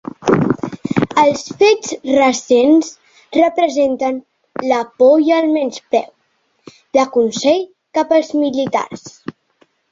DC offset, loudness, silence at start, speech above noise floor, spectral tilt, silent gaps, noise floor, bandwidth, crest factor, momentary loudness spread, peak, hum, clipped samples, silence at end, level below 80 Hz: under 0.1%; -15 LUFS; 0.2 s; 49 dB; -5 dB/octave; none; -63 dBFS; 7.8 kHz; 14 dB; 14 LU; 0 dBFS; none; under 0.1%; 0.6 s; -56 dBFS